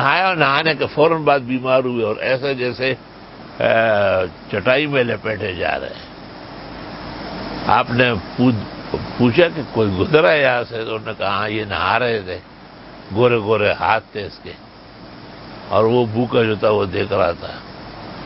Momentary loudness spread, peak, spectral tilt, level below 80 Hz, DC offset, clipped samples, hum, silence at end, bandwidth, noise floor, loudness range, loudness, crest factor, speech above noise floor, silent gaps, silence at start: 20 LU; 0 dBFS; -9.5 dB/octave; -44 dBFS; under 0.1%; under 0.1%; none; 0 s; 5.8 kHz; -39 dBFS; 4 LU; -18 LUFS; 18 dB; 21 dB; none; 0 s